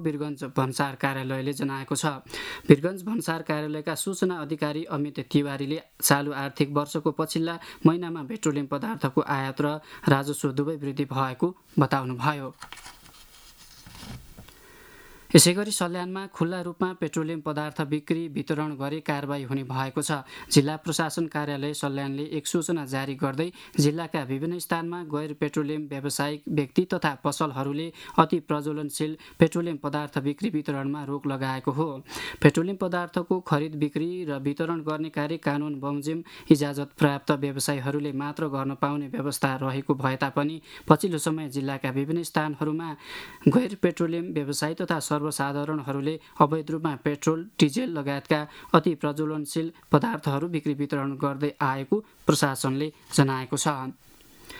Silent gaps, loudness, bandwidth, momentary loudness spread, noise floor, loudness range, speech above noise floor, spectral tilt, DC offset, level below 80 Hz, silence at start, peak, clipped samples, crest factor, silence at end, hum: none; -27 LUFS; over 20 kHz; 8 LU; -51 dBFS; 3 LU; 24 dB; -5 dB/octave; under 0.1%; -62 dBFS; 0 s; 0 dBFS; under 0.1%; 26 dB; 0 s; none